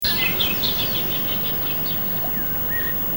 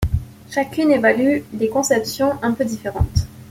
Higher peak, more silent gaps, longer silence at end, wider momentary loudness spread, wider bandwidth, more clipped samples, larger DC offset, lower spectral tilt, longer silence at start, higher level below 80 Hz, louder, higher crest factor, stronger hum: second, -6 dBFS vs -2 dBFS; neither; about the same, 0 s vs 0 s; second, 2 LU vs 9 LU; first, 19 kHz vs 16.5 kHz; neither; first, 0.8% vs under 0.1%; second, -3.5 dB/octave vs -5.5 dB/octave; about the same, 0 s vs 0 s; second, -42 dBFS vs -34 dBFS; about the same, -19 LUFS vs -19 LUFS; about the same, 16 dB vs 18 dB; neither